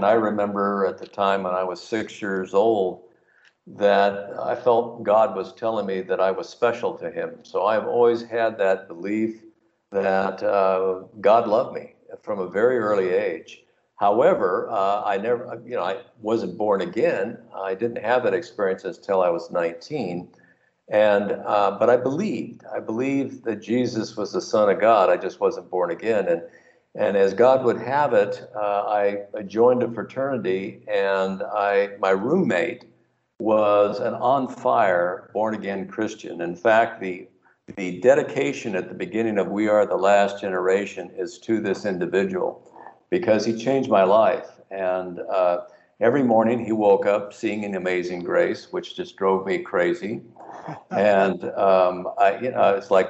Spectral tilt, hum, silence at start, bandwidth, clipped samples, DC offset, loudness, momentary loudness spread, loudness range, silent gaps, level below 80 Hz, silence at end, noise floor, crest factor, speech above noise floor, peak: -6 dB/octave; none; 0 s; 8 kHz; under 0.1%; under 0.1%; -22 LUFS; 11 LU; 3 LU; none; -72 dBFS; 0 s; -63 dBFS; 18 dB; 41 dB; -4 dBFS